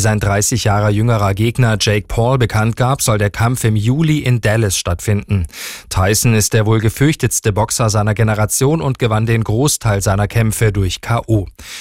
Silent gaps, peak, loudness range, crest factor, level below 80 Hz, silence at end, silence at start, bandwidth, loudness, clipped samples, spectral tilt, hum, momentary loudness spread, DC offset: none; -2 dBFS; 1 LU; 12 dB; -34 dBFS; 0 s; 0 s; 16.5 kHz; -15 LUFS; under 0.1%; -5 dB/octave; none; 4 LU; 0.7%